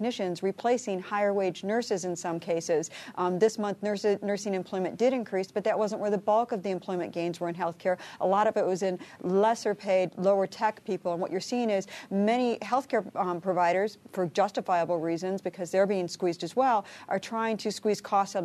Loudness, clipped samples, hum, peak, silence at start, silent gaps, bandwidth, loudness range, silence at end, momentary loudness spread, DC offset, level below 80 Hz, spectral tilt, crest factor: -29 LUFS; under 0.1%; none; -12 dBFS; 0 s; none; 13 kHz; 2 LU; 0 s; 7 LU; under 0.1%; -78 dBFS; -5 dB/octave; 16 dB